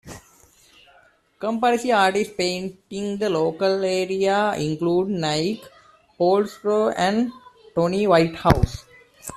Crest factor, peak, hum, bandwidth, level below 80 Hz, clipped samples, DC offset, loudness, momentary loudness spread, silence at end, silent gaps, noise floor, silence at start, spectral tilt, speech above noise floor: 20 dB; -2 dBFS; none; 14 kHz; -42 dBFS; under 0.1%; under 0.1%; -22 LUFS; 11 LU; 0 s; none; -57 dBFS; 0.05 s; -5.5 dB/octave; 36 dB